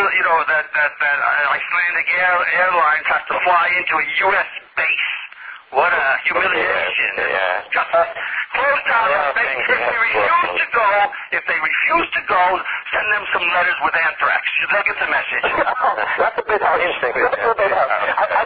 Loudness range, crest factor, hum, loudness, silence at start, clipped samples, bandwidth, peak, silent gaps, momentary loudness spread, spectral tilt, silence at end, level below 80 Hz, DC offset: 2 LU; 14 dB; none; -16 LUFS; 0 s; under 0.1%; 5 kHz; -2 dBFS; none; 4 LU; -5.5 dB/octave; 0 s; -54 dBFS; under 0.1%